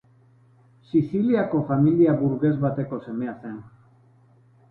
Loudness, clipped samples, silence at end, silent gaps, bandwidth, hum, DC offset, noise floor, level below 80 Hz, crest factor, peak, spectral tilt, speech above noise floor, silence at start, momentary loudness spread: -23 LUFS; under 0.1%; 1 s; none; 4.4 kHz; none; under 0.1%; -56 dBFS; -58 dBFS; 16 dB; -8 dBFS; -12 dB/octave; 34 dB; 0.95 s; 14 LU